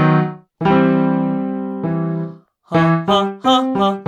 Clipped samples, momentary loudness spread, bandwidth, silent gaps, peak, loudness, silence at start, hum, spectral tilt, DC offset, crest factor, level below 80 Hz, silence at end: under 0.1%; 9 LU; 8.4 kHz; none; -2 dBFS; -17 LUFS; 0 s; none; -7 dB/octave; under 0.1%; 14 dB; -52 dBFS; 0 s